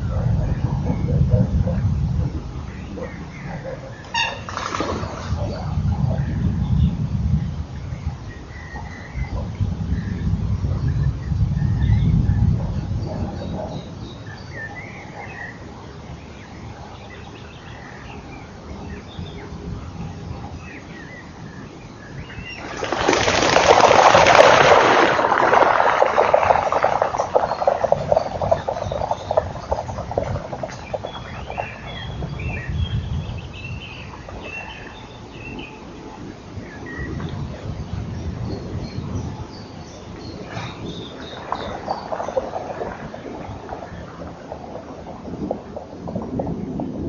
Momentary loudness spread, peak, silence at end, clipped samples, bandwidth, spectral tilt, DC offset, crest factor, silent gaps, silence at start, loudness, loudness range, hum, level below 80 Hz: 20 LU; 0 dBFS; 0 s; under 0.1%; 7.2 kHz; -4.5 dB/octave; under 0.1%; 22 dB; none; 0 s; -21 LUFS; 20 LU; none; -32 dBFS